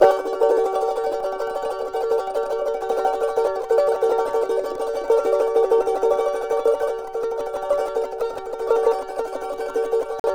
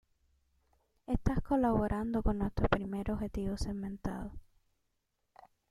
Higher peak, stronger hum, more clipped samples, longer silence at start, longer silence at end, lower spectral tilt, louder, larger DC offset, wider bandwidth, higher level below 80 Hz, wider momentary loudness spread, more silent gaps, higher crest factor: first, -2 dBFS vs -14 dBFS; neither; neither; second, 0 s vs 1.1 s; second, 0 s vs 1.3 s; second, -3.5 dB/octave vs -7.5 dB/octave; first, -22 LUFS vs -35 LUFS; neither; first, 15 kHz vs 13.5 kHz; second, -52 dBFS vs -42 dBFS; about the same, 8 LU vs 10 LU; first, 10.20-10.24 s vs none; about the same, 18 dB vs 22 dB